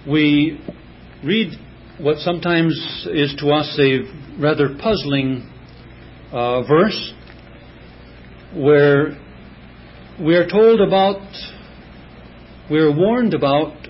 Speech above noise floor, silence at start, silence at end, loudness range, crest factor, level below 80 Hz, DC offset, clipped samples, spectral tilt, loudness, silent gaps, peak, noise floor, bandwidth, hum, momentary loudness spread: 24 dB; 0 s; 0 s; 4 LU; 16 dB; -46 dBFS; under 0.1%; under 0.1%; -10.5 dB/octave; -17 LUFS; none; -2 dBFS; -40 dBFS; 5.8 kHz; none; 17 LU